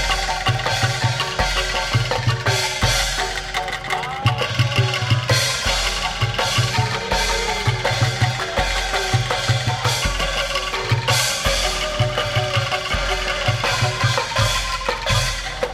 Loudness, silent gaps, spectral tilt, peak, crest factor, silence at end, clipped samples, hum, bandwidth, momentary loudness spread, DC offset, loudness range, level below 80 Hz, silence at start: -19 LUFS; none; -3 dB/octave; -4 dBFS; 16 dB; 0 s; under 0.1%; none; 16 kHz; 3 LU; under 0.1%; 1 LU; -32 dBFS; 0 s